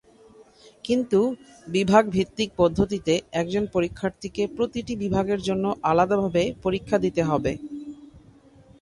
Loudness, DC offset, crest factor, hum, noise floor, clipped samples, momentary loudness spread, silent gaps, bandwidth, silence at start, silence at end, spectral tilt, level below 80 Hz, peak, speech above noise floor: -24 LUFS; under 0.1%; 20 dB; none; -52 dBFS; under 0.1%; 9 LU; none; 11.5 kHz; 0.4 s; 0.65 s; -6 dB/octave; -48 dBFS; -4 dBFS; 29 dB